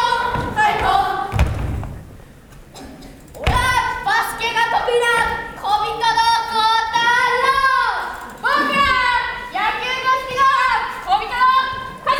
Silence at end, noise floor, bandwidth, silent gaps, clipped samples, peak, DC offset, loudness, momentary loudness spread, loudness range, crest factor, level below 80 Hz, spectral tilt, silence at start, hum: 0 s; -41 dBFS; over 20 kHz; none; under 0.1%; 0 dBFS; under 0.1%; -17 LUFS; 10 LU; 5 LU; 18 dB; -34 dBFS; -3.5 dB/octave; 0 s; none